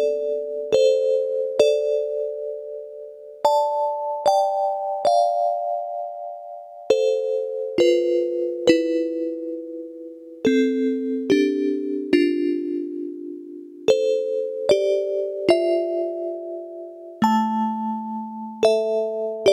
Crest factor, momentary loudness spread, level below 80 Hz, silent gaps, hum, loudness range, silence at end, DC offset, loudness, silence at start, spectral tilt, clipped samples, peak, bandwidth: 20 dB; 15 LU; -68 dBFS; none; none; 2 LU; 0 s; under 0.1%; -22 LUFS; 0 s; -5 dB/octave; under 0.1%; -2 dBFS; 14 kHz